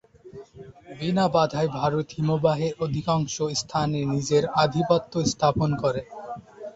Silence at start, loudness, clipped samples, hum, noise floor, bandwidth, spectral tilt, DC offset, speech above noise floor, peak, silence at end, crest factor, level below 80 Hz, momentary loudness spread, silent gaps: 0.25 s; -24 LUFS; under 0.1%; none; -45 dBFS; 8 kHz; -5.5 dB/octave; under 0.1%; 22 dB; -8 dBFS; 0.05 s; 18 dB; -52 dBFS; 16 LU; none